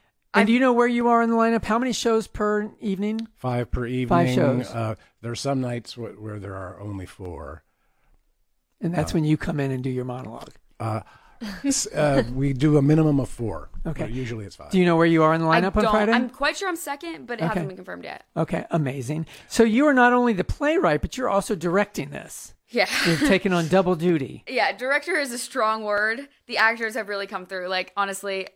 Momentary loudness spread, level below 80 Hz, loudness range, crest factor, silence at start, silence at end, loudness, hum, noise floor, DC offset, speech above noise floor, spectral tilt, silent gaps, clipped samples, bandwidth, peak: 16 LU; -44 dBFS; 7 LU; 20 dB; 0.35 s; 0.05 s; -23 LUFS; none; -68 dBFS; under 0.1%; 45 dB; -5.5 dB/octave; none; under 0.1%; 16.5 kHz; -4 dBFS